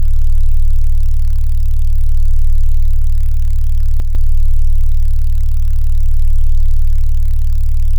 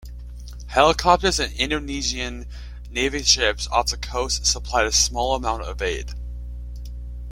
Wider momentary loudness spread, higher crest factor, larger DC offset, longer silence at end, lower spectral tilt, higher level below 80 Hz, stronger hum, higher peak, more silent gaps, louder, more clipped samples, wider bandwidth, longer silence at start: second, 1 LU vs 19 LU; second, 2 dB vs 22 dB; neither; about the same, 0 s vs 0 s; first, -6.5 dB/octave vs -2.5 dB/octave; first, -8 dBFS vs -32 dBFS; second, none vs 60 Hz at -30 dBFS; about the same, -4 dBFS vs -2 dBFS; neither; first, -18 LUFS vs -21 LUFS; neither; second, 0.2 kHz vs 16.5 kHz; about the same, 0 s vs 0 s